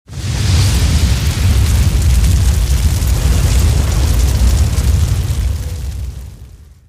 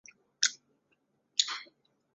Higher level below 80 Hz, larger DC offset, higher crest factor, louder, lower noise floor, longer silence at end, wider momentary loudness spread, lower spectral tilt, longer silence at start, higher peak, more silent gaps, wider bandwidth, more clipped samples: first, -14 dBFS vs under -90 dBFS; neither; second, 10 dB vs 32 dB; first, -14 LUFS vs -31 LUFS; second, -36 dBFS vs -76 dBFS; second, 0.25 s vs 0.5 s; first, 10 LU vs 4 LU; first, -5 dB/octave vs 6 dB/octave; second, 0.1 s vs 0.4 s; first, -2 dBFS vs -6 dBFS; neither; first, 15.5 kHz vs 7.6 kHz; neither